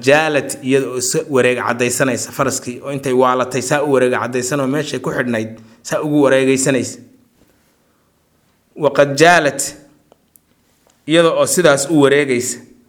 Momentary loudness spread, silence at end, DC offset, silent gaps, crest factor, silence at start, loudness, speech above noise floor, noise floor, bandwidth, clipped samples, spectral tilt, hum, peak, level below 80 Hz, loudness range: 11 LU; 0.3 s; under 0.1%; none; 16 dB; 0 s; -15 LUFS; 44 dB; -59 dBFS; 19.5 kHz; under 0.1%; -4 dB/octave; none; 0 dBFS; -58 dBFS; 3 LU